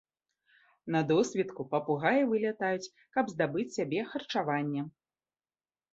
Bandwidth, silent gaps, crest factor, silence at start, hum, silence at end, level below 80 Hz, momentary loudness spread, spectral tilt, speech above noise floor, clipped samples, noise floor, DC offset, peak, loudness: 8 kHz; none; 20 dB; 0.85 s; none; 1.05 s; -74 dBFS; 8 LU; -6 dB/octave; over 59 dB; under 0.1%; under -90 dBFS; under 0.1%; -12 dBFS; -31 LUFS